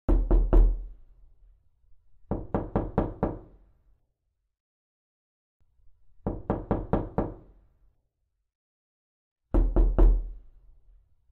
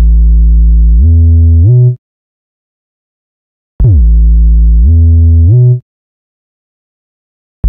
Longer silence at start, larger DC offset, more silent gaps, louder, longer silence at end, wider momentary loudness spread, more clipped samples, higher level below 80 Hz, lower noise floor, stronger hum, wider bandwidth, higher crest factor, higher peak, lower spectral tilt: about the same, 0.1 s vs 0 s; neither; second, 4.60-5.60 s, 8.55-9.36 s vs 1.98-3.79 s, 5.82-7.63 s; second, -29 LUFS vs -7 LUFS; first, 0.95 s vs 0 s; first, 14 LU vs 4 LU; neither; second, -30 dBFS vs -8 dBFS; second, -78 dBFS vs under -90 dBFS; neither; first, 2.3 kHz vs 0.9 kHz; first, 20 dB vs 6 dB; second, -8 dBFS vs 0 dBFS; second, -11.5 dB/octave vs -17 dB/octave